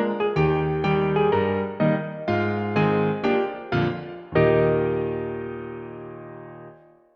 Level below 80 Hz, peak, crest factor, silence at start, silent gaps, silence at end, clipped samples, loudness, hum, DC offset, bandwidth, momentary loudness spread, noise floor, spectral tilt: -48 dBFS; -8 dBFS; 16 dB; 0 s; none; 0.4 s; under 0.1%; -23 LUFS; none; under 0.1%; 6.2 kHz; 17 LU; -48 dBFS; -9 dB/octave